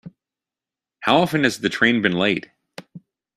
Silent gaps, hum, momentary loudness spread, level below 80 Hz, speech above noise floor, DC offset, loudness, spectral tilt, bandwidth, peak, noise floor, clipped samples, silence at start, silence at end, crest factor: none; none; 23 LU; -58 dBFS; 70 dB; under 0.1%; -19 LUFS; -5 dB/octave; 15 kHz; -2 dBFS; -89 dBFS; under 0.1%; 0.05 s; 0.4 s; 22 dB